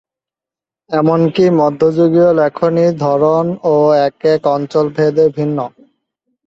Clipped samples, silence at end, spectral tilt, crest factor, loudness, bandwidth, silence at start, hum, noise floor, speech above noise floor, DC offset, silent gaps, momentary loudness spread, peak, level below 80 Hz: under 0.1%; 0.8 s; -8 dB/octave; 12 dB; -13 LUFS; 7.6 kHz; 0.9 s; none; -88 dBFS; 76 dB; under 0.1%; none; 5 LU; -2 dBFS; -56 dBFS